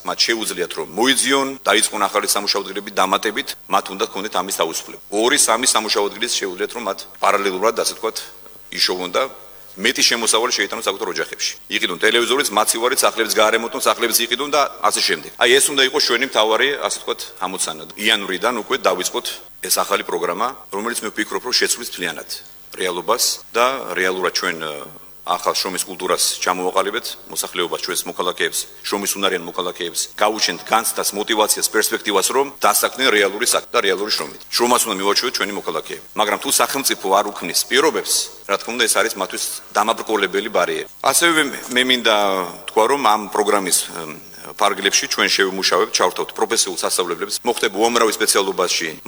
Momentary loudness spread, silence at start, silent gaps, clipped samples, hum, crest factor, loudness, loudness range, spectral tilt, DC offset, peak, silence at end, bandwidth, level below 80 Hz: 9 LU; 0 s; none; under 0.1%; none; 18 dB; -18 LUFS; 4 LU; -1 dB/octave; under 0.1%; 0 dBFS; 0 s; over 20 kHz; -60 dBFS